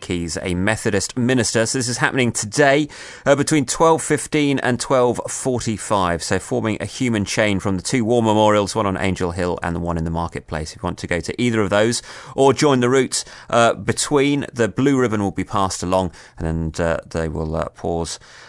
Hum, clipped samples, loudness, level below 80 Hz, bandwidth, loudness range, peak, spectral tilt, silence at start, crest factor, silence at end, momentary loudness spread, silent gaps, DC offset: none; under 0.1%; -19 LUFS; -44 dBFS; 11.5 kHz; 4 LU; -2 dBFS; -4.5 dB/octave; 0 s; 18 dB; 0 s; 9 LU; none; under 0.1%